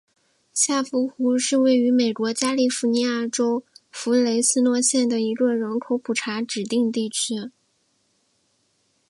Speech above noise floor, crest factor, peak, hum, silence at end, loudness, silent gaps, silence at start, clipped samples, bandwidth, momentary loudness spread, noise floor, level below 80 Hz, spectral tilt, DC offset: 46 dB; 18 dB; -4 dBFS; none; 1.6 s; -22 LUFS; none; 0.55 s; under 0.1%; 11.5 kHz; 8 LU; -68 dBFS; -76 dBFS; -2.5 dB/octave; under 0.1%